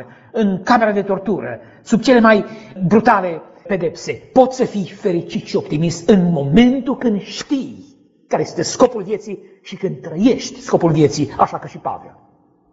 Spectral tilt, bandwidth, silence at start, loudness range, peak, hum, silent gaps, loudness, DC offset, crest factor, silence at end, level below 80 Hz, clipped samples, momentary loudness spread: -5.5 dB/octave; 8 kHz; 0 s; 5 LU; 0 dBFS; none; none; -17 LUFS; under 0.1%; 16 dB; 0.65 s; -46 dBFS; under 0.1%; 14 LU